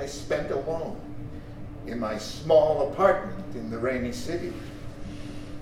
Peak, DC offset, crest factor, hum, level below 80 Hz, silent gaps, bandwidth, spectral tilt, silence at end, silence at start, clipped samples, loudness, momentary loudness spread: -8 dBFS; under 0.1%; 20 dB; none; -44 dBFS; none; 14.5 kHz; -5.5 dB/octave; 0 s; 0 s; under 0.1%; -27 LUFS; 19 LU